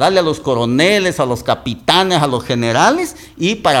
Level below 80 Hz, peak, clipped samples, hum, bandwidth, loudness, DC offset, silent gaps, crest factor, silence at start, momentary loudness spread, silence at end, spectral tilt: -44 dBFS; 0 dBFS; under 0.1%; none; 17.5 kHz; -14 LUFS; under 0.1%; none; 14 dB; 0 s; 7 LU; 0 s; -4.5 dB/octave